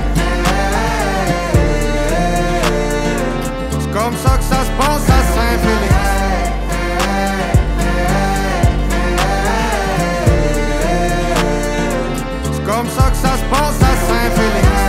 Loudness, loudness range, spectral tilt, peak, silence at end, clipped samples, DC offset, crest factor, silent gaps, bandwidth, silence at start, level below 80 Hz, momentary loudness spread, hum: -15 LUFS; 1 LU; -5 dB/octave; 0 dBFS; 0 s; under 0.1%; under 0.1%; 12 dB; none; 16 kHz; 0 s; -18 dBFS; 5 LU; none